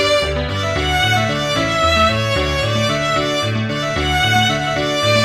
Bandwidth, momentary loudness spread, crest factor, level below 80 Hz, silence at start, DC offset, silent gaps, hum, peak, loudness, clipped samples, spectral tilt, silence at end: 15 kHz; 6 LU; 14 dB; -30 dBFS; 0 s; under 0.1%; none; none; -2 dBFS; -16 LUFS; under 0.1%; -4 dB/octave; 0 s